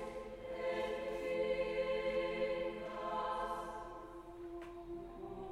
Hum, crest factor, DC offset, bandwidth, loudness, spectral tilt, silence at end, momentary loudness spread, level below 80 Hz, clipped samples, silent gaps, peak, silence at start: none; 14 dB; under 0.1%; 12.5 kHz; -41 LUFS; -5.5 dB/octave; 0 s; 12 LU; -60 dBFS; under 0.1%; none; -26 dBFS; 0 s